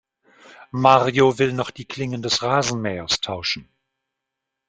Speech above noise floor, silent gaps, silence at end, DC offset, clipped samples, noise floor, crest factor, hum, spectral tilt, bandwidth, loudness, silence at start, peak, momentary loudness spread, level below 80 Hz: 62 dB; none; 1.05 s; under 0.1%; under 0.1%; -82 dBFS; 22 dB; none; -4 dB/octave; 9.4 kHz; -20 LUFS; 0.5 s; 0 dBFS; 14 LU; -56 dBFS